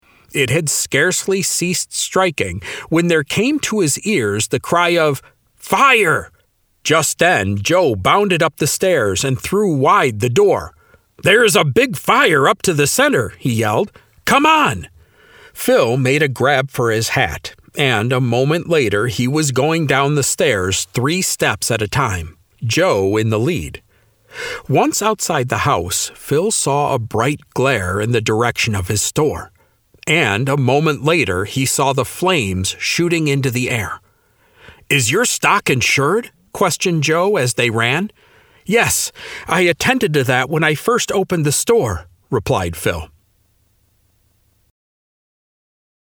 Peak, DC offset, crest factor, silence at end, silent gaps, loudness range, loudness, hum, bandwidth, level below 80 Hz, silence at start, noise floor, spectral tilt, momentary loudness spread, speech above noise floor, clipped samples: 0 dBFS; under 0.1%; 16 dB; 3.05 s; none; 4 LU; -16 LUFS; none; over 20 kHz; -46 dBFS; 0.3 s; -59 dBFS; -4 dB/octave; 7 LU; 43 dB; under 0.1%